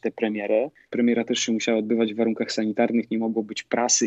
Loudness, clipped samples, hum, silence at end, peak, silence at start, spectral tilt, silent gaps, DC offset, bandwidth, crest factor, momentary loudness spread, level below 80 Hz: -24 LUFS; under 0.1%; none; 0 s; -8 dBFS; 0.05 s; -3 dB/octave; none; under 0.1%; 8.2 kHz; 16 dB; 4 LU; -76 dBFS